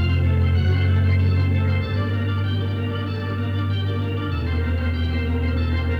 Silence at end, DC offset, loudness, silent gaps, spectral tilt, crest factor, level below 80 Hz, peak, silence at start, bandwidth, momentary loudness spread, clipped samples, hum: 0 s; under 0.1%; -22 LUFS; none; -8.5 dB/octave; 10 dB; -30 dBFS; -10 dBFS; 0 s; 5 kHz; 6 LU; under 0.1%; none